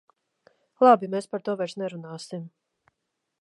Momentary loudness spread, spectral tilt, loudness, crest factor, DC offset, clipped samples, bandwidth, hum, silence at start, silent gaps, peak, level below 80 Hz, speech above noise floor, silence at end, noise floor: 20 LU; -6 dB/octave; -24 LUFS; 22 dB; under 0.1%; under 0.1%; 11.5 kHz; none; 0.8 s; none; -4 dBFS; -84 dBFS; 57 dB; 0.95 s; -81 dBFS